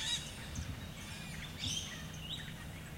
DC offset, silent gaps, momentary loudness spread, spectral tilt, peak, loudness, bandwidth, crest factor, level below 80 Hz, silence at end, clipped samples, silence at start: under 0.1%; none; 8 LU; -2.5 dB/octave; -26 dBFS; -42 LUFS; 16.5 kHz; 18 dB; -54 dBFS; 0 s; under 0.1%; 0 s